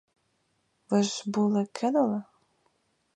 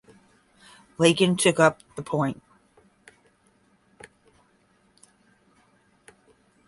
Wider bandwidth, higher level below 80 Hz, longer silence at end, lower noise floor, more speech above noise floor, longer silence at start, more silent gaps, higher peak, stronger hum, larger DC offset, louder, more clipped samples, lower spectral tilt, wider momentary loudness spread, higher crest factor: second, 10 kHz vs 11.5 kHz; second, -78 dBFS vs -66 dBFS; second, 0.95 s vs 4.35 s; first, -73 dBFS vs -64 dBFS; first, 47 dB vs 42 dB; about the same, 0.9 s vs 1 s; neither; second, -12 dBFS vs -4 dBFS; neither; neither; second, -27 LUFS vs -22 LUFS; neither; about the same, -5.5 dB/octave vs -4.5 dB/octave; second, 3 LU vs 21 LU; second, 18 dB vs 24 dB